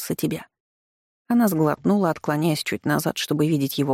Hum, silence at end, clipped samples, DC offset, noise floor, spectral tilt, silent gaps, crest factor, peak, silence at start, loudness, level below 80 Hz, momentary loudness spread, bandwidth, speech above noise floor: none; 0 s; under 0.1%; under 0.1%; under -90 dBFS; -5.5 dB/octave; 0.60-1.25 s; 14 dB; -8 dBFS; 0 s; -22 LUFS; -62 dBFS; 6 LU; 17 kHz; over 68 dB